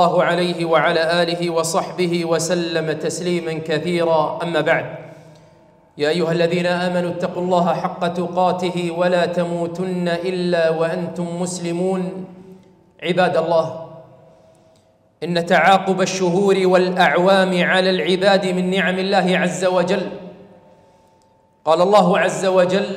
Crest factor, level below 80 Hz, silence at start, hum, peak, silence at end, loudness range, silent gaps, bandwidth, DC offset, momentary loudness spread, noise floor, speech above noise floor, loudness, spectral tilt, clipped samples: 16 dB; -62 dBFS; 0 s; none; -2 dBFS; 0 s; 6 LU; none; 15 kHz; under 0.1%; 9 LU; -56 dBFS; 38 dB; -18 LUFS; -5 dB/octave; under 0.1%